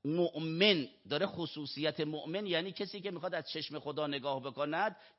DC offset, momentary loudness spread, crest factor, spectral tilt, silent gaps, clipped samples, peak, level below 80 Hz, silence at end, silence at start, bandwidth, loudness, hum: under 0.1%; 11 LU; 22 dB; -3 dB/octave; none; under 0.1%; -14 dBFS; -80 dBFS; 0.1 s; 0.05 s; 5.8 kHz; -35 LUFS; none